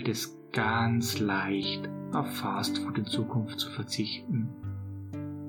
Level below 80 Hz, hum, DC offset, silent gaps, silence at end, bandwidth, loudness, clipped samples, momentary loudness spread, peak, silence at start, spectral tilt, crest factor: -68 dBFS; none; under 0.1%; none; 0 s; 19 kHz; -31 LUFS; under 0.1%; 11 LU; -14 dBFS; 0 s; -5 dB/octave; 18 dB